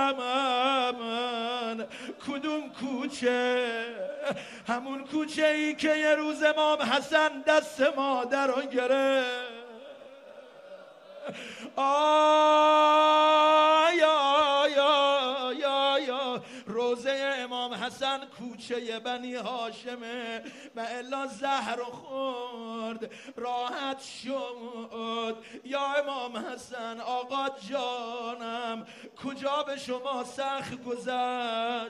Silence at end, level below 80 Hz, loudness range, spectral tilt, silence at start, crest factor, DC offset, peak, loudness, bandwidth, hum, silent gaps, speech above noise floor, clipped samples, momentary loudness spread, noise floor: 0 s; -76 dBFS; 12 LU; -3 dB/octave; 0 s; 20 dB; under 0.1%; -10 dBFS; -28 LUFS; 12.5 kHz; none; none; 21 dB; under 0.1%; 17 LU; -49 dBFS